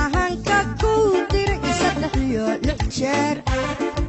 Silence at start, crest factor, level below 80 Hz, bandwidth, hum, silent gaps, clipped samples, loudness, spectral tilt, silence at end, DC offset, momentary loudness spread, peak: 0 s; 14 dB; -30 dBFS; 8.4 kHz; none; none; under 0.1%; -21 LUFS; -5 dB/octave; 0 s; under 0.1%; 5 LU; -8 dBFS